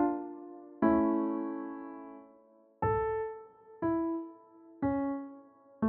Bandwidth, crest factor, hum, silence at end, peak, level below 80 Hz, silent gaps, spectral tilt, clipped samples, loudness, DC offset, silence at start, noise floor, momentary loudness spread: 3.3 kHz; 18 dB; none; 0 s; -16 dBFS; -60 dBFS; none; -9 dB/octave; under 0.1%; -33 LUFS; under 0.1%; 0 s; -62 dBFS; 20 LU